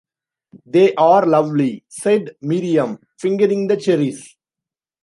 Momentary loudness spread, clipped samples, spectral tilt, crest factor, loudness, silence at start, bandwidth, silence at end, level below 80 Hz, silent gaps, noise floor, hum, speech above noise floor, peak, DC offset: 11 LU; under 0.1%; -6.5 dB/octave; 16 dB; -17 LUFS; 0.55 s; 11.5 kHz; 0.75 s; -70 dBFS; none; -88 dBFS; none; 71 dB; -2 dBFS; under 0.1%